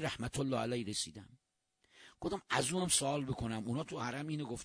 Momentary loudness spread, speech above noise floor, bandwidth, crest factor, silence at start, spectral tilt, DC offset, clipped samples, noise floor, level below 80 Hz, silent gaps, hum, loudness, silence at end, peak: 10 LU; 42 dB; 10.5 kHz; 22 dB; 0 s; -3.5 dB/octave; under 0.1%; under 0.1%; -80 dBFS; -62 dBFS; none; none; -37 LUFS; 0 s; -16 dBFS